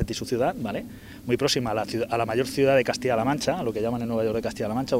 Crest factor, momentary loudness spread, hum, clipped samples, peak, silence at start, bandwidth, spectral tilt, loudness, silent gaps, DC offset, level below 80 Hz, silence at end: 16 dB; 9 LU; none; under 0.1%; -8 dBFS; 0 s; 16 kHz; -5 dB/octave; -25 LUFS; none; under 0.1%; -48 dBFS; 0 s